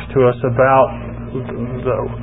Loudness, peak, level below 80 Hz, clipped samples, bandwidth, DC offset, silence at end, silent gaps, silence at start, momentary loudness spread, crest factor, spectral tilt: -17 LUFS; 0 dBFS; -36 dBFS; under 0.1%; 4 kHz; 0.5%; 0 s; none; 0 s; 14 LU; 16 dB; -13 dB/octave